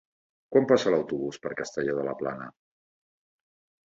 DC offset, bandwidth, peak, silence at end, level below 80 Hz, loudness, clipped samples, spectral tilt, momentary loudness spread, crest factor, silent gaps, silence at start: under 0.1%; 7.8 kHz; -6 dBFS; 1.35 s; -68 dBFS; -27 LUFS; under 0.1%; -5.5 dB/octave; 12 LU; 22 dB; none; 0.5 s